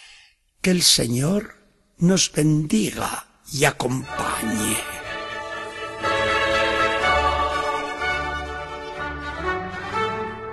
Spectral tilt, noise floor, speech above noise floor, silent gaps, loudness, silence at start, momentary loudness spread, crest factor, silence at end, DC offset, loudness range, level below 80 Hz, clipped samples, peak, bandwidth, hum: -3.5 dB/octave; -54 dBFS; 33 dB; none; -22 LUFS; 0 s; 12 LU; 20 dB; 0 s; under 0.1%; 4 LU; -42 dBFS; under 0.1%; -4 dBFS; 13 kHz; none